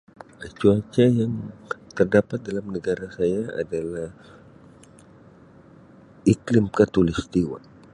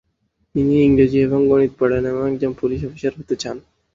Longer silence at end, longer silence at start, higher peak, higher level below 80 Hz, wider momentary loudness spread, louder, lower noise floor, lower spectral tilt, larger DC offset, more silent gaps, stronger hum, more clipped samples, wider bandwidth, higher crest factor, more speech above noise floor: about the same, 0.35 s vs 0.35 s; second, 0.4 s vs 0.55 s; about the same, -4 dBFS vs -2 dBFS; second, -48 dBFS vs -42 dBFS; about the same, 14 LU vs 12 LU; second, -23 LUFS vs -18 LUFS; second, -50 dBFS vs -67 dBFS; about the same, -7.5 dB/octave vs -7.5 dB/octave; neither; neither; neither; neither; first, 11.5 kHz vs 7.6 kHz; about the same, 20 dB vs 16 dB; second, 27 dB vs 50 dB